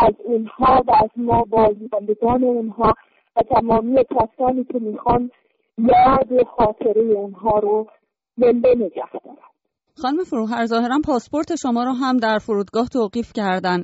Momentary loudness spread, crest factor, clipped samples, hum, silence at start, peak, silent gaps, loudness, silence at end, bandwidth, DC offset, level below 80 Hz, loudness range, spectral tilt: 9 LU; 12 dB; under 0.1%; none; 0 s; -6 dBFS; none; -18 LUFS; 0 s; 8 kHz; under 0.1%; -42 dBFS; 4 LU; -5 dB/octave